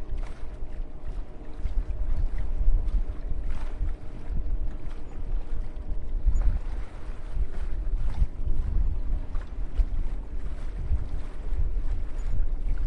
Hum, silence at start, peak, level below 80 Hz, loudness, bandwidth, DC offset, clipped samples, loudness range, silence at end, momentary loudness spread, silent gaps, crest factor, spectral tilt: none; 0 s; -10 dBFS; -28 dBFS; -35 LUFS; 3.3 kHz; under 0.1%; under 0.1%; 2 LU; 0 s; 10 LU; none; 16 dB; -8 dB/octave